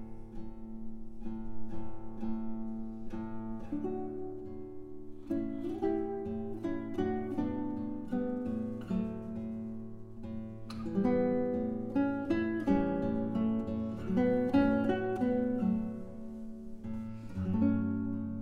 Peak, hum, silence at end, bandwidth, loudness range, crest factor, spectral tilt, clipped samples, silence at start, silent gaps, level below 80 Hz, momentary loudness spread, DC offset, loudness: -16 dBFS; none; 0 s; 6.8 kHz; 9 LU; 18 dB; -9 dB/octave; under 0.1%; 0 s; none; -52 dBFS; 16 LU; under 0.1%; -35 LUFS